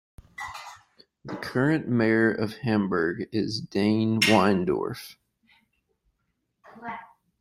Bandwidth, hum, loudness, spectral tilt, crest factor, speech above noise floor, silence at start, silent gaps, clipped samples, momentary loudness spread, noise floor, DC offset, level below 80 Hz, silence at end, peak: 16 kHz; none; -24 LUFS; -5.5 dB/octave; 20 dB; 52 dB; 0.4 s; none; under 0.1%; 20 LU; -77 dBFS; under 0.1%; -62 dBFS; 0.35 s; -6 dBFS